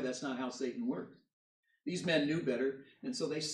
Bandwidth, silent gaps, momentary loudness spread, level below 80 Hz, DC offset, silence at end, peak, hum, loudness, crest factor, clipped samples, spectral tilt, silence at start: 11.5 kHz; 1.33-1.63 s; 12 LU; -80 dBFS; under 0.1%; 0 s; -18 dBFS; none; -37 LUFS; 20 dB; under 0.1%; -4.5 dB/octave; 0 s